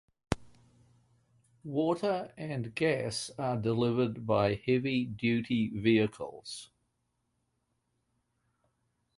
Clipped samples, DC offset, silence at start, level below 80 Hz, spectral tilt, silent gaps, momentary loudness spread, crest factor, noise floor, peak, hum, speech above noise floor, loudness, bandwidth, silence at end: under 0.1%; under 0.1%; 0.3 s; -58 dBFS; -6 dB/octave; none; 11 LU; 24 dB; -79 dBFS; -10 dBFS; none; 49 dB; -31 LUFS; 11.5 kHz; 2.55 s